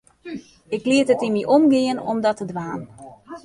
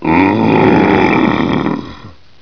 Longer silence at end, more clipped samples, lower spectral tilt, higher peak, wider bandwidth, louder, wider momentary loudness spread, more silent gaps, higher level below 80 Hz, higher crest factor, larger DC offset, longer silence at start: second, 0.05 s vs 0.3 s; second, under 0.1% vs 0.2%; second, -5.5 dB/octave vs -8 dB/octave; second, -4 dBFS vs 0 dBFS; first, 11.5 kHz vs 5.4 kHz; second, -20 LUFS vs -11 LUFS; first, 20 LU vs 11 LU; neither; second, -62 dBFS vs -38 dBFS; about the same, 16 dB vs 12 dB; second, under 0.1% vs 1%; first, 0.25 s vs 0 s